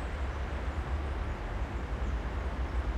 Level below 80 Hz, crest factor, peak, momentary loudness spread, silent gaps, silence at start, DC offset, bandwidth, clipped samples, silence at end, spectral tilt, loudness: -34 dBFS; 12 dB; -22 dBFS; 2 LU; none; 0 s; under 0.1%; 8.8 kHz; under 0.1%; 0 s; -7 dB/octave; -36 LUFS